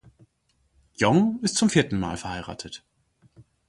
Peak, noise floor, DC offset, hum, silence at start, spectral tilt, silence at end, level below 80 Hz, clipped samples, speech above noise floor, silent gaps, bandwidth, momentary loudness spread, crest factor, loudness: -4 dBFS; -69 dBFS; under 0.1%; none; 1 s; -4.5 dB/octave; 0.25 s; -52 dBFS; under 0.1%; 46 dB; none; 11.5 kHz; 17 LU; 22 dB; -23 LUFS